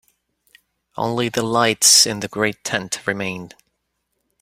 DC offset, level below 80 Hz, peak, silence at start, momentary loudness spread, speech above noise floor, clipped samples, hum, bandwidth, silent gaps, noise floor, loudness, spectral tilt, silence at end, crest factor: under 0.1%; -60 dBFS; 0 dBFS; 0.95 s; 16 LU; 54 dB; under 0.1%; none; 16.5 kHz; none; -73 dBFS; -17 LUFS; -1.5 dB/octave; 0.95 s; 22 dB